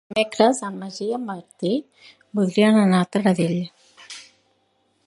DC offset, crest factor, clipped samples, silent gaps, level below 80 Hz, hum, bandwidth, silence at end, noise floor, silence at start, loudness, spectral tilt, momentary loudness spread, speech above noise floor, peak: under 0.1%; 20 dB; under 0.1%; none; -68 dBFS; none; 11.5 kHz; 0.85 s; -66 dBFS; 0.1 s; -21 LUFS; -6 dB/octave; 19 LU; 46 dB; -2 dBFS